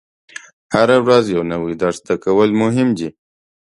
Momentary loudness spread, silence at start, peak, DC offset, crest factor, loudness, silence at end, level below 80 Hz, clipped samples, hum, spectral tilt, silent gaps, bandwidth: 23 LU; 0.7 s; 0 dBFS; under 0.1%; 16 dB; -16 LUFS; 0.6 s; -52 dBFS; under 0.1%; none; -6 dB/octave; none; 11.5 kHz